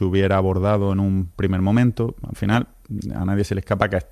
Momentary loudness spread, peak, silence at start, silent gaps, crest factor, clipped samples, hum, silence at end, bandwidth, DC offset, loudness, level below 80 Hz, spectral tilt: 8 LU; -2 dBFS; 0 s; none; 18 dB; under 0.1%; none; 0.1 s; 13 kHz; under 0.1%; -21 LUFS; -40 dBFS; -8 dB/octave